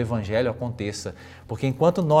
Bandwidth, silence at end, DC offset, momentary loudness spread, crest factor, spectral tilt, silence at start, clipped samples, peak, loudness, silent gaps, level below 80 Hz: 15 kHz; 0 s; under 0.1%; 15 LU; 20 dB; -6.5 dB/octave; 0 s; under 0.1%; -4 dBFS; -25 LUFS; none; -56 dBFS